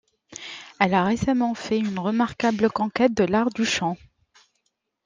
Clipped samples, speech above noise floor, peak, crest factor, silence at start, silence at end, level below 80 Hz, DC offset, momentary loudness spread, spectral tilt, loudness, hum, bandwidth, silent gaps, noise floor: under 0.1%; 52 dB; -4 dBFS; 20 dB; 0.3 s; 1.1 s; -54 dBFS; under 0.1%; 16 LU; -5 dB/octave; -23 LUFS; none; 9.8 kHz; none; -74 dBFS